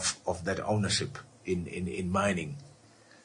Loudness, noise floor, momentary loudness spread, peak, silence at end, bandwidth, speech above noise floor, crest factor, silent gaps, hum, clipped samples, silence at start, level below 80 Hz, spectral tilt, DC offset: -32 LUFS; -58 dBFS; 12 LU; -14 dBFS; 0.55 s; 11 kHz; 27 dB; 18 dB; none; none; under 0.1%; 0 s; -62 dBFS; -4 dB/octave; under 0.1%